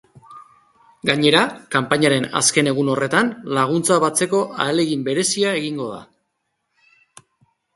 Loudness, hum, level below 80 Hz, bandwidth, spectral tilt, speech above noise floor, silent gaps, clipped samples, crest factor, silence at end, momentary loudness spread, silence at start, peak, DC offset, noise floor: -18 LUFS; none; -62 dBFS; 12 kHz; -3.5 dB/octave; 55 dB; none; under 0.1%; 20 dB; 1.75 s; 8 LU; 0.3 s; 0 dBFS; under 0.1%; -74 dBFS